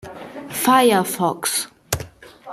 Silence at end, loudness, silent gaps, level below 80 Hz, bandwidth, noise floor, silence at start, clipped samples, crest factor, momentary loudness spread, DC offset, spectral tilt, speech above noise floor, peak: 0 s; -19 LUFS; none; -50 dBFS; 15.5 kHz; -40 dBFS; 0.05 s; under 0.1%; 20 dB; 21 LU; under 0.1%; -3.5 dB/octave; 23 dB; 0 dBFS